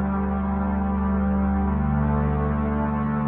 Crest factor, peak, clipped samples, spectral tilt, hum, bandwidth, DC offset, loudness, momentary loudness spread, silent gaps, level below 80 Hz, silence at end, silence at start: 10 dB; -12 dBFS; under 0.1%; -13 dB/octave; none; 3.5 kHz; under 0.1%; -24 LUFS; 2 LU; none; -28 dBFS; 0 s; 0 s